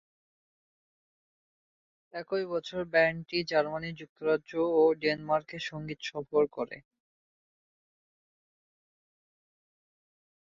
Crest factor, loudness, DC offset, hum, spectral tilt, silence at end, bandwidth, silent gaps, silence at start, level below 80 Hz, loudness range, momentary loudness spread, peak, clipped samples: 20 dB; -30 LUFS; under 0.1%; none; -5.5 dB/octave; 3.65 s; 7.4 kHz; 4.09-4.16 s; 2.15 s; -70 dBFS; 8 LU; 13 LU; -14 dBFS; under 0.1%